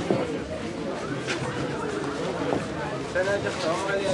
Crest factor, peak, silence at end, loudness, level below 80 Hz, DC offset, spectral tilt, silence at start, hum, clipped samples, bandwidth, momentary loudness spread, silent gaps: 18 dB; -10 dBFS; 0 s; -28 LUFS; -52 dBFS; under 0.1%; -5 dB/octave; 0 s; none; under 0.1%; 11.5 kHz; 6 LU; none